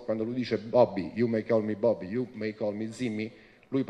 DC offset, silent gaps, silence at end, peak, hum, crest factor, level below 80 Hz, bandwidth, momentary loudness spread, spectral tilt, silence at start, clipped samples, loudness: under 0.1%; none; 0 s; -10 dBFS; none; 20 dB; -64 dBFS; 10 kHz; 9 LU; -7.5 dB/octave; 0 s; under 0.1%; -29 LUFS